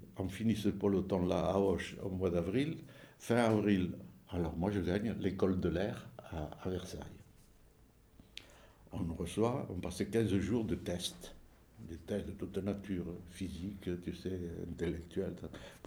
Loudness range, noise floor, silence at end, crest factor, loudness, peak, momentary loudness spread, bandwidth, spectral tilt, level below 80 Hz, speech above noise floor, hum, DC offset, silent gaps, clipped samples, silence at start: 8 LU; -64 dBFS; 0 s; 20 dB; -37 LUFS; -18 dBFS; 16 LU; over 20 kHz; -6.5 dB/octave; -56 dBFS; 28 dB; none; under 0.1%; none; under 0.1%; 0 s